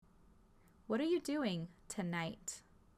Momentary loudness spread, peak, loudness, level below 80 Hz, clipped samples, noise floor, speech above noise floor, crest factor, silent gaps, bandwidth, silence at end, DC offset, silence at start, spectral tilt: 11 LU; -26 dBFS; -40 LUFS; -70 dBFS; under 0.1%; -66 dBFS; 27 dB; 16 dB; none; 15 kHz; 0.35 s; under 0.1%; 0.9 s; -5 dB/octave